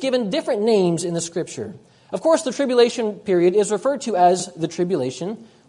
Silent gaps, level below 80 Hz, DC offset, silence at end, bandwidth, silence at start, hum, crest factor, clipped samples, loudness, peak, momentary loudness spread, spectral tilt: none; -68 dBFS; under 0.1%; 0.25 s; 11 kHz; 0 s; none; 16 dB; under 0.1%; -20 LUFS; -4 dBFS; 13 LU; -5 dB/octave